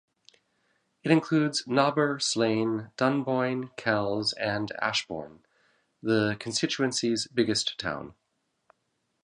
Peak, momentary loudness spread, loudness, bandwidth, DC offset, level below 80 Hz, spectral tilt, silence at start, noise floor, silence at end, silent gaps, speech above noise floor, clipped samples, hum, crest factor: -6 dBFS; 9 LU; -27 LUFS; 11 kHz; under 0.1%; -66 dBFS; -4 dB/octave; 1.05 s; -77 dBFS; 1.1 s; none; 50 dB; under 0.1%; none; 22 dB